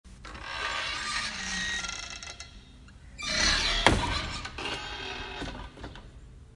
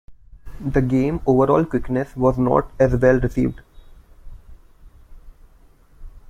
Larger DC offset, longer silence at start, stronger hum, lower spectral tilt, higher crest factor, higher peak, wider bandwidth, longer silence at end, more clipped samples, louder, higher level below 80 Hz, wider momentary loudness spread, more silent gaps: neither; about the same, 0.05 s vs 0.1 s; neither; second, -2.5 dB/octave vs -9 dB/octave; first, 30 dB vs 18 dB; about the same, -2 dBFS vs -2 dBFS; first, 11.5 kHz vs 9.8 kHz; about the same, 0 s vs 0.1 s; neither; second, -29 LUFS vs -19 LUFS; second, -42 dBFS vs -36 dBFS; first, 21 LU vs 7 LU; neither